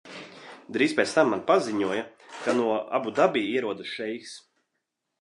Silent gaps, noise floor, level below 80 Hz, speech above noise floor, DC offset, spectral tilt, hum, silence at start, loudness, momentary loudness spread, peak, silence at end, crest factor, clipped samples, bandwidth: none; -81 dBFS; -74 dBFS; 55 dB; under 0.1%; -4.5 dB/octave; none; 0.05 s; -26 LUFS; 20 LU; -6 dBFS; 0.8 s; 22 dB; under 0.1%; 11.5 kHz